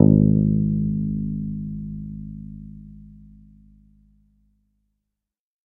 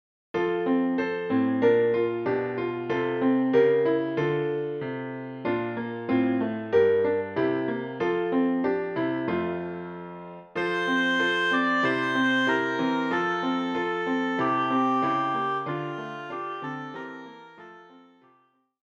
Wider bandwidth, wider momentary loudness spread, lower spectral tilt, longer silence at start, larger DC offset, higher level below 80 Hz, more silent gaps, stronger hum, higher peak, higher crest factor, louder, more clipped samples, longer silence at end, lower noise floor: second, 1.1 kHz vs 8.8 kHz; first, 24 LU vs 13 LU; first, -16 dB/octave vs -6.5 dB/octave; second, 0 s vs 0.35 s; neither; first, -40 dBFS vs -70 dBFS; neither; neither; first, 0 dBFS vs -10 dBFS; first, 24 dB vs 16 dB; first, -22 LUFS vs -26 LUFS; neither; first, 2.5 s vs 0.9 s; first, -84 dBFS vs -65 dBFS